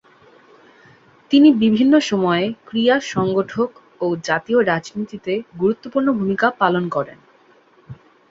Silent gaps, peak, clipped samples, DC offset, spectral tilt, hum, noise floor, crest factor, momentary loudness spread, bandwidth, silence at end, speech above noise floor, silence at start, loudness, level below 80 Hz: none; -2 dBFS; under 0.1%; under 0.1%; -6 dB/octave; none; -53 dBFS; 18 dB; 12 LU; 7.8 kHz; 0.35 s; 35 dB; 1.3 s; -18 LUFS; -60 dBFS